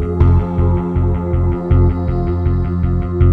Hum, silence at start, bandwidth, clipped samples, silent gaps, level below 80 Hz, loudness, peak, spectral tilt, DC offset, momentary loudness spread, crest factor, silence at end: none; 0 s; 3.4 kHz; under 0.1%; none; -20 dBFS; -16 LUFS; 0 dBFS; -11.5 dB/octave; under 0.1%; 4 LU; 14 dB; 0 s